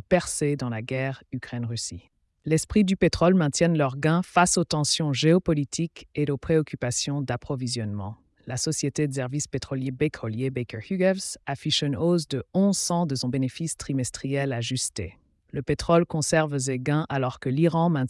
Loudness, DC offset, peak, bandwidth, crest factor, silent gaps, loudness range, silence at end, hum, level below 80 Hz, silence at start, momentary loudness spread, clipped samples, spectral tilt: -25 LUFS; under 0.1%; -8 dBFS; 12 kHz; 16 dB; none; 6 LU; 0 s; none; -50 dBFS; 0.1 s; 10 LU; under 0.1%; -5 dB/octave